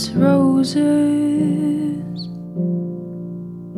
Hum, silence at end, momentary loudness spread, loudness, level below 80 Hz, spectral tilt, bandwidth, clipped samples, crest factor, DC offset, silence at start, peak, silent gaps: none; 0 s; 15 LU; -18 LUFS; -56 dBFS; -7 dB/octave; 12 kHz; under 0.1%; 16 dB; under 0.1%; 0 s; -4 dBFS; none